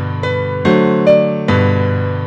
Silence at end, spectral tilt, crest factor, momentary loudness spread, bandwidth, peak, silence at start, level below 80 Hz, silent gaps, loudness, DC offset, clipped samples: 0 s; -8.5 dB/octave; 14 dB; 7 LU; 7.8 kHz; 0 dBFS; 0 s; -46 dBFS; none; -13 LUFS; under 0.1%; under 0.1%